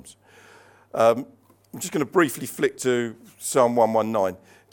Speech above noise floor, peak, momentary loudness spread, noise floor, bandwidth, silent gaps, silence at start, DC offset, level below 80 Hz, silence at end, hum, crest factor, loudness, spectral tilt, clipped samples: 29 dB; -4 dBFS; 13 LU; -52 dBFS; 17.5 kHz; none; 0.05 s; under 0.1%; -72 dBFS; 0.35 s; none; 20 dB; -23 LUFS; -4.5 dB/octave; under 0.1%